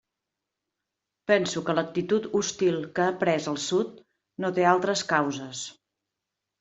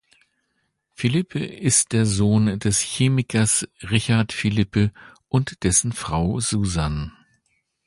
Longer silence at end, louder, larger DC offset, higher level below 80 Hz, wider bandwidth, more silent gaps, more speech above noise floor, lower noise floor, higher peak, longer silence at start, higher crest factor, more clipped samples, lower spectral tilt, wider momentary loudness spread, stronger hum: first, 0.9 s vs 0.75 s; second, -26 LUFS vs -21 LUFS; neither; second, -70 dBFS vs -40 dBFS; second, 8.2 kHz vs 11.5 kHz; neither; first, 60 dB vs 51 dB; first, -86 dBFS vs -72 dBFS; about the same, -6 dBFS vs -4 dBFS; first, 1.3 s vs 1 s; about the same, 22 dB vs 18 dB; neither; about the same, -4 dB/octave vs -4.5 dB/octave; first, 13 LU vs 6 LU; neither